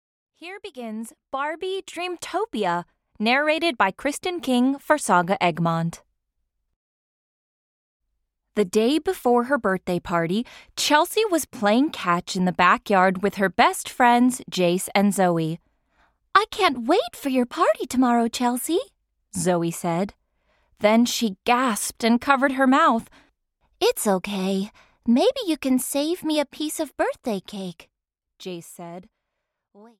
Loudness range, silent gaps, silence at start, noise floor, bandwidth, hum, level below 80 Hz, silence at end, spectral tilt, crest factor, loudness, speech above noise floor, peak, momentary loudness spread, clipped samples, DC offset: 7 LU; 6.76-8.00 s; 0.4 s; -80 dBFS; 17 kHz; none; -60 dBFS; 1 s; -4.5 dB/octave; 20 dB; -22 LUFS; 58 dB; -4 dBFS; 15 LU; under 0.1%; under 0.1%